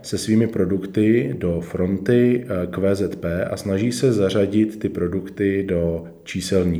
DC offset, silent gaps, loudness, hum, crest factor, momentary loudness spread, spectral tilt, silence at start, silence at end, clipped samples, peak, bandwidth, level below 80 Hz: under 0.1%; none; -21 LUFS; none; 16 dB; 7 LU; -6.5 dB/octave; 0 s; 0 s; under 0.1%; -4 dBFS; over 20 kHz; -46 dBFS